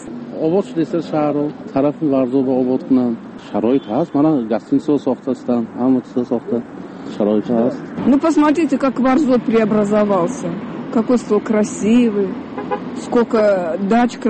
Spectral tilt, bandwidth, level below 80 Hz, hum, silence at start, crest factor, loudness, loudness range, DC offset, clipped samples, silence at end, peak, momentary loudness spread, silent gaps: -7 dB/octave; 8.8 kHz; -52 dBFS; none; 0 s; 12 dB; -17 LUFS; 3 LU; under 0.1%; under 0.1%; 0 s; -4 dBFS; 9 LU; none